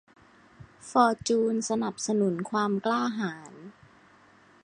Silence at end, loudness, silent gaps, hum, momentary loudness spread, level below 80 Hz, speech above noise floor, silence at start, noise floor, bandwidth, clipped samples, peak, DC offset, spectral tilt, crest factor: 0.9 s; -27 LUFS; none; none; 20 LU; -66 dBFS; 31 dB; 0.6 s; -58 dBFS; 11 kHz; under 0.1%; -8 dBFS; under 0.1%; -4.5 dB/octave; 22 dB